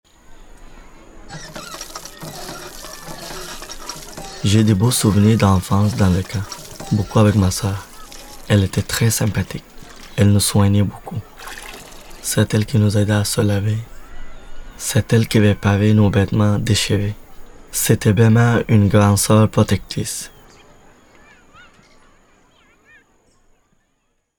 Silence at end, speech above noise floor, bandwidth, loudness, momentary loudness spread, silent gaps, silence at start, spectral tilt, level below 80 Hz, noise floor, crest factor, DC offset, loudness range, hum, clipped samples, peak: 4.1 s; 51 dB; 20 kHz; -17 LUFS; 19 LU; none; 0.3 s; -5.5 dB/octave; -40 dBFS; -67 dBFS; 18 dB; under 0.1%; 13 LU; none; under 0.1%; 0 dBFS